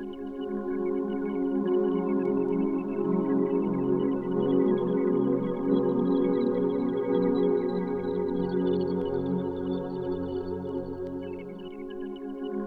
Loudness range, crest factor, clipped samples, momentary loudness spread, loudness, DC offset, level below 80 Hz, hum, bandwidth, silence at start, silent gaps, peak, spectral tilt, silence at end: 5 LU; 14 dB; under 0.1%; 11 LU; -28 LUFS; under 0.1%; -56 dBFS; none; 4.7 kHz; 0 s; none; -12 dBFS; -10.5 dB/octave; 0 s